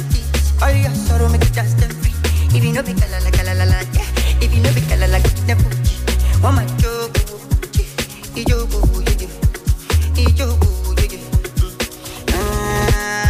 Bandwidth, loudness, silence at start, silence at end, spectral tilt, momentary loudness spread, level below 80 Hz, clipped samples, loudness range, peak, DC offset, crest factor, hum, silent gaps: 15.5 kHz; -17 LUFS; 0 s; 0 s; -5.5 dB/octave; 6 LU; -18 dBFS; under 0.1%; 2 LU; -4 dBFS; under 0.1%; 10 dB; none; none